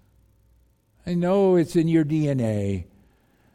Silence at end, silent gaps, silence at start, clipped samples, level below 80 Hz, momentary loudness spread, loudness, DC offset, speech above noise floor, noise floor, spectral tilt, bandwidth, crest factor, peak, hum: 0.7 s; none; 1.05 s; under 0.1%; -54 dBFS; 10 LU; -22 LUFS; under 0.1%; 40 dB; -61 dBFS; -8 dB/octave; 14.5 kHz; 14 dB; -10 dBFS; none